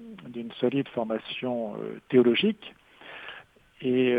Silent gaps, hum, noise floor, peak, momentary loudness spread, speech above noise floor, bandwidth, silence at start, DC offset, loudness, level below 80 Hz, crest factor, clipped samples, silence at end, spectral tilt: none; none; -49 dBFS; -8 dBFS; 20 LU; 23 dB; 4.9 kHz; 0 s; under 0.1%; -27 LUFS; -68 dBFS; 20 dB; under 0.1%; 0 s; -8 dB/octave